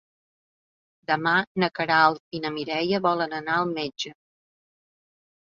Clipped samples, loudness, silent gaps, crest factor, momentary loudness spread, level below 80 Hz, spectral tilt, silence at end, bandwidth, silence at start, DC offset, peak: under 0.1%; -24 LUFS; 1.47-1.55 s, 2.20-2.31 s; 24 dB; 12 LU; -70 dBFS; -5 dB/octave; 1.4 s; 7.6 kHz; 1.1 s; under 0.1%; -4 dBFS